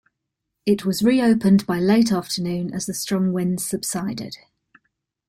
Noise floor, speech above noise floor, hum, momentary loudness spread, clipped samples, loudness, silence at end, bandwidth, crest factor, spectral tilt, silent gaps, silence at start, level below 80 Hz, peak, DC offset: -80 dBFS; 60 dB; none; 11 LU; under 0.1%; -21 LUFS; 0.9 s; 16 kHz; 16 dB; -5.5 dB/octave; none; 0.65 s; -58 dBFS; -6 dBFS; under 0.1%